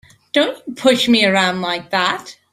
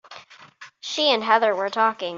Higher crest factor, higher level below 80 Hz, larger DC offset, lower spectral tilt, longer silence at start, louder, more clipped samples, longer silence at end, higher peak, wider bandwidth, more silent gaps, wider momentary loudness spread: about the same, 16 dB vs 20 dB; first, -60 dBFS vs -76 dBFS; neither; first, -4 dB/octave vs -2 dB/octave; first, 0.35 s vs 0.1 s; first, -16 LUFS vs -21 LUFS; neither; first, 0.2 s vs 0 s; about the same, -2 dBFS vs -4 dBFS; first, 15.5 kHz vs 7.8 kHz; neither; about the same, 8 LU vs 10 LU